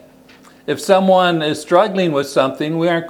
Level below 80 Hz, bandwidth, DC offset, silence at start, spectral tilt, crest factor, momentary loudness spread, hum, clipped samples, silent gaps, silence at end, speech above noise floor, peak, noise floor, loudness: -64 dBFS; 17 kHz; under 0.1%; 0.7 s; -5.5 dB/octave; 16 dB; 9 LU; none; under 0.1%; none; 0 s; 30 dB; 0 dBFS; -45 dBFS; -16 LUFS